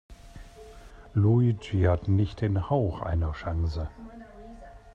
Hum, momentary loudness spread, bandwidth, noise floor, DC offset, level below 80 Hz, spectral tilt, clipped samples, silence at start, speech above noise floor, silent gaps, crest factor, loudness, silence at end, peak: none; 23 LU; 7.6 kHz; -47 dBFS; under 0.1%; -42 dBFS; -9 dB/octave; under 0.1%; 0.1 s; 22 dB; none; 16 dB; -27 LUFS; 0.05 s; -12 dBFS